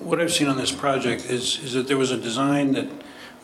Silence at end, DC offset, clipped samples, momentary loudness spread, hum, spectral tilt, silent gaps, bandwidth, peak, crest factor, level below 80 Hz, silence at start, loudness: 0.05 s; under 0.1%; under 0.1%; 6 LU; none; -4 dB/octave; none; 13.5 kHz; -6 dBFS; 18 dB; -62 dBFS; 0 s; -23 LUFS